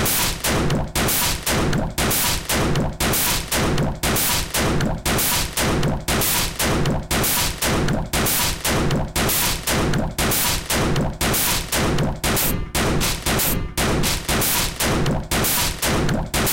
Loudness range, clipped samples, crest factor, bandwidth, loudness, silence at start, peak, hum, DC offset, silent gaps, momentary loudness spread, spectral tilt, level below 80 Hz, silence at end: 0 LU; under 0.1%; 12 dB; 17 kHz; -20 LUFS; 0 s; -8 dBFS; none; 0.4%; none; 4 LU; -3 dB/octave; -30 dBFS; 0 s